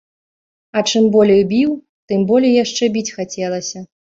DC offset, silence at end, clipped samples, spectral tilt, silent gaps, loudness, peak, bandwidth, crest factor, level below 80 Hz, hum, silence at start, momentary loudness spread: under 0.1%; 0.3 s; under 0.1%; -5 dB/octave; 1.89-2.08 s; -16 LUFS; -2 dBFS; 7.8 kHz; 14 dB; -56 dBFS; none; 0.75 s; 12 LU